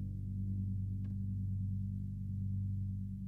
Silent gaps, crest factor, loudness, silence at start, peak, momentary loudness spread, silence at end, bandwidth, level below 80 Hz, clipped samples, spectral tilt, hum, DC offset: none; 8 dB; -40 LUFS; 0 s; -30 dBFS; 3 LU; 0 s; 0.6 kHz; -50 dBFS; under 0.1%; -11.5 dB/octave; none; under 0.1%